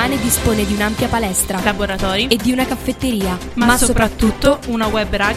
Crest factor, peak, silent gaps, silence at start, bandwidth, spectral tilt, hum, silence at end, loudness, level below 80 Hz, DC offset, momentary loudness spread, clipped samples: 16 dB; 0 dBFS; none; 0 s; 16.5 kHz; -4 dB/octave; none; 0 s; -16 LUFS; -28 dBFS; under 0.1%; 5 LU; under 0.1%